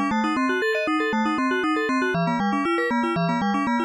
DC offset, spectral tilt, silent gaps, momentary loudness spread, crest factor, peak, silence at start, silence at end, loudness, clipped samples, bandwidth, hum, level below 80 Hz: under 0.1%; -6 dB/octave; none; 1 LU; 10 dB; -12 dBFS; 0 s; 0 s; -22 LUFS; under 0.1%; 12.5 kHz; none; -58 dBFS